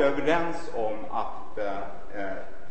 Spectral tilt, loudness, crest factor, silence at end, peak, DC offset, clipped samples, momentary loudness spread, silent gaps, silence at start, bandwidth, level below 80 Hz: -5.5 dB/octave; -31 LUFS; 18 dB; 0 s; -10 dBFS; 5%; under 0.1%; 11 LU; none; 0 s; 8.8 kHz; -50 dBFS